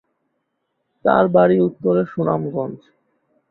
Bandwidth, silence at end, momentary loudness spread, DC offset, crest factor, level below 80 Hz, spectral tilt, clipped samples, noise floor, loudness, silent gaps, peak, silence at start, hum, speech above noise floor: 4.2 kHz; 0.75 s; 11 LU; under 0.1%; 18 dB; -58 dBFS; -11 dB/octave; under 0.1%; -73 dBFS; -18 LUFS; none; -2 dBFS; 1.05 s; none; 56 dB